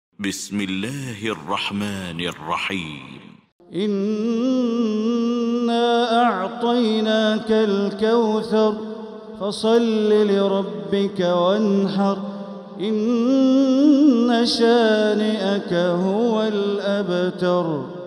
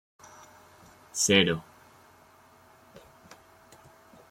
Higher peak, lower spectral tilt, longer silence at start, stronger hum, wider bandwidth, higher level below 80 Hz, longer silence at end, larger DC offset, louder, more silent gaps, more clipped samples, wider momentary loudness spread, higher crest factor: about the same, -6 dBFS vs -8 dBFS; first, -6 dB/octave vs -3 dB/octave; second, 0.2 s vs 1.15 s; neither; second, 14 kHz vs 16.5 kHz; about the same, -64 dBFS vs -66 dBFS; second, 0 s vs 2.7 s; neither; first, -20 LUFS vs -25 LUFS; first, 3.52-3.59 s vs none; neither; second, 11 LU vs 29 LU; second, 14 dB vs 26 dB